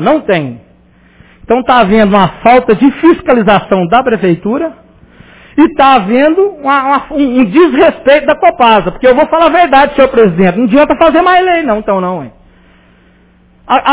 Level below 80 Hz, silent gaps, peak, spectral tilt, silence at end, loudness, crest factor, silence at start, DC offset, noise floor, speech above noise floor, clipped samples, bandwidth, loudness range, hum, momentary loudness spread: -38 dBFS; none; 0 dBFS; -10 dB/octave; 0 s; -8 LUFS; 8 dB; 0 s; under 0.1%; -45 dBFS; 37 dB; 2%; 4 kHz; 3 LU; none; 7 LU